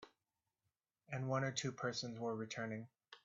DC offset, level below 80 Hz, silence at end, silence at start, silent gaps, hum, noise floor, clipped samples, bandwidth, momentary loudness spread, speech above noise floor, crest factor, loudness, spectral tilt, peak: under 0.1%; -82 dBFS; 0.1 s; 0 s; none; none; under -90 dBFS; under 0.1%; 8 kHz; 10 LU; over 48 dB; 20 dB; -43 LUFS; -4.5 dB/octave; -26 dBFS